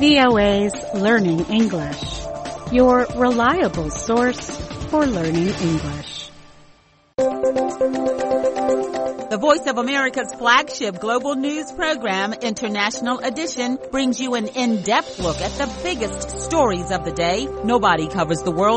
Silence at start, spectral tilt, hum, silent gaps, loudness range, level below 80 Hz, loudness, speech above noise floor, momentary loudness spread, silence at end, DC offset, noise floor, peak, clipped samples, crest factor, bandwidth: 0 s; -4.5 dB/octave; none; none; 4 LU; -40 dBFS; -20 LUFS; 34 dB; 9 LU; 0 s; under 0.1%; -53 dBFS; -2 dBFS; under 0.1%; 18 dB; 8.8 kHz